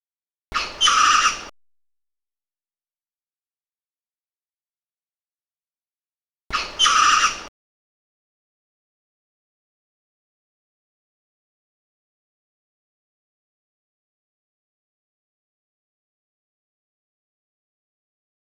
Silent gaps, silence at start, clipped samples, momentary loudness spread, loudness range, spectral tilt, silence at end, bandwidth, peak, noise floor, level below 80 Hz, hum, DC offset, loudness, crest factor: 3.87-3.91 s, 4.20-4.29 s, 4.70-4.74 s, 5.21-5.25 s, 5.95-5.99 s; 0.5 s; under 0.1%; 14 LU; 9 LU; 1.5 dB/octave; 11.05 s; 13.5 kHz; -4 dBFS; under -90 dBFS; -56 dBFS; none; under 0.1%; -17 LUFS; 24 dB